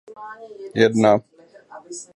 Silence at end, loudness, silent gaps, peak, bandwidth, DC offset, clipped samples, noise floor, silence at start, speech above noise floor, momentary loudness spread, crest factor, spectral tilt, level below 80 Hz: 0.1 s; -18 LUFS; none; 0 dBFS; 11.5 kHz; under 0.1%; under 0.1%; -44 dBFS; 0.2 s; 24 dB; 22 LU; 22 dB; -5.5 dB/octave; -64 dBFS